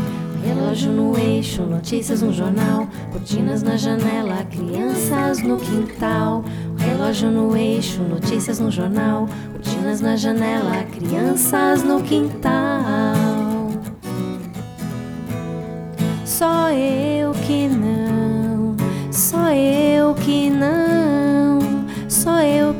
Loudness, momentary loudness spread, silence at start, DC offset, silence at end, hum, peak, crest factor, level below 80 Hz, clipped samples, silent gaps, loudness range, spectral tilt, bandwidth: -19 LUFS; 10 LU; 0 s; under 0.1%; 0 s; none; -4 dBFS; 16 dB; -46 dBFS; under 0.1%; none; 5 LU; -5.5 dB/octave; over 20 kHz